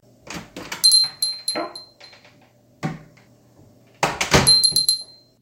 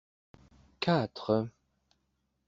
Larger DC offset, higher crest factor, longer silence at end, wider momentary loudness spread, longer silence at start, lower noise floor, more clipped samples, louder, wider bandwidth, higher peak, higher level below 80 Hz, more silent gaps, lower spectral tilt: neither; about the same, 22 dB vs 22 dB; second, 0.35 s vs 1 s; first, 22 LU vs 6 LU; second, 0.25 s vs 0.8 s; second, -54 dBFS vs -79 dBFS; neither; first, -16 LUFS vs -32 LUFS; first, 17 kHz vs 7.6 kHz; first, 0 dBFS vs -14 dBFS; first, -44 dBFS vs -68 dBFS; neither; second, -1.5 dB/octave vs -5 dB/octave